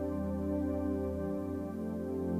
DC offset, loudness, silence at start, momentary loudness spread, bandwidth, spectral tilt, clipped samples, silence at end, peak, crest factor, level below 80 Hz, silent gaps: under 0.1%; -36 LUFS; 0 s; 4 LU; 15.5 kHz; -9.5 dB/octave; under 0.1%; 0 s; -24 dBFS; 12 dB; -54 dBFS; none